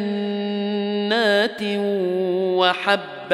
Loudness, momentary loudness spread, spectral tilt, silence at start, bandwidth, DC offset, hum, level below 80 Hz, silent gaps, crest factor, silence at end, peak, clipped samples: -21 LUFS; 6 LU; -5.5 dB/octave; 0 s; 13 kHz; under 0.1%; none; -74 dBFS; none; 18 dB; 0 s; -2 dBFS; under 0.1%